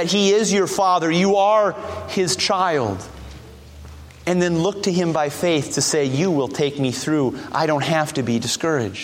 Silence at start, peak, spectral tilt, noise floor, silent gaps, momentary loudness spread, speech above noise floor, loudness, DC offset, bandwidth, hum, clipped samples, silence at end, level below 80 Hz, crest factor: 0 s; -4 dBFS; -4.5 dB/octave; -40 dBFS; none; 7 LU; 20 dB; -19 LUFS; under 0.1%; 16.5 kHz; none; under 0.1%; 0 s; -48 dBFS; 16 dB